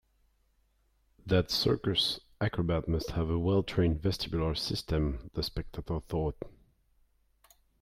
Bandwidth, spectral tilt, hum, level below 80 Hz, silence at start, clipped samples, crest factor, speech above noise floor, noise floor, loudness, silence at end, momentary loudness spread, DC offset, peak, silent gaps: 15.5 kHz; -6 dB/octave; none; -44 dBFS; 1.25 s; under 0.1%; 18 dB; 40 dB; -71 dBFS; -31 LUFS; 1.3 s; 9 LU; under 0.1%; -14 dBFS; none